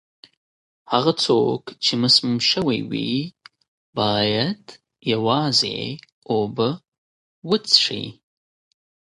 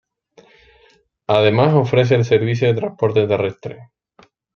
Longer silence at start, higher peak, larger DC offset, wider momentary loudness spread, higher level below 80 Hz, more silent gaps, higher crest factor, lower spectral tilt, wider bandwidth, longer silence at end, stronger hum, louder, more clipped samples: second, 0.9 s vs 1.3 s; about the same, 0 dBFS vs 0 dBFS; neither; first, 16 LU vs 13 LU; about the same, -60 dBFS vs -56 dBFS; first, 3.68-3.93 s, 6.12-6.22 s, 6.88-6.92 s, 6.98-7.42 s vs none; about the same, 22 dB vs 18 dB; second, -4.5 dB/octave vs -7.5 dB/octave; first, 11.5 kHz vs 6.8 kHz; first, 1.05 s vs 0.7 s; neither; second, -20 LUFS vs -16 LUFS; neither